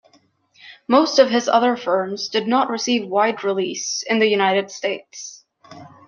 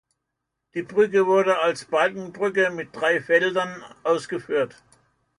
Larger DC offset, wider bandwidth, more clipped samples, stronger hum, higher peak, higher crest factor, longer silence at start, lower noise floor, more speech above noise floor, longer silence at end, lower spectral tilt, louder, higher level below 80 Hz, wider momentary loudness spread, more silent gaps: neither; second, 7.4 kHz vs 11 kHz; neither; neither; first, -2 dBFS vs -6 dBFS; about the same, 18 dB vs 18 dB; about the same, 0.65 s vs 0.75 s; second, -58 dBFS vs -81 dBFS; second, 39 dB vs 59 dB; second, 0.2 s vs 0.7 s; second, -3 dB/octave vs -4.5 dB/octave; first, -19 LUFS vs -23 LUFS; about the same, -68 dBFS vs -70 dBFS; about the same, 11 LU vs 11 LU; neither